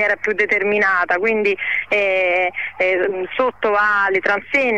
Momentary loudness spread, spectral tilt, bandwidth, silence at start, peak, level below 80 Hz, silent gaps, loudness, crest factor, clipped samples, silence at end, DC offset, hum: 5 LU; -4.5 dB/octave; 8.6 kHz; 0 s; -6 dBFS; -58 dBFS; none; -17 LUFS; 12 dB; under 0.1%; 0 s; 0.4%; none